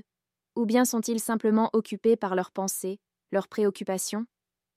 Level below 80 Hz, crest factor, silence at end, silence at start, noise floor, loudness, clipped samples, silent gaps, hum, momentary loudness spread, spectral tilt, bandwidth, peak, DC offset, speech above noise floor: -76 dBFS; 16 dB; 0.5 s; 0.55 s; -89 dBFS; -27 LUFS; under 0.1%; none; none; 11 LU; -4.5 dB/octave; 15.5 kHz; -12 dBFS; under 0.1%; 62 dB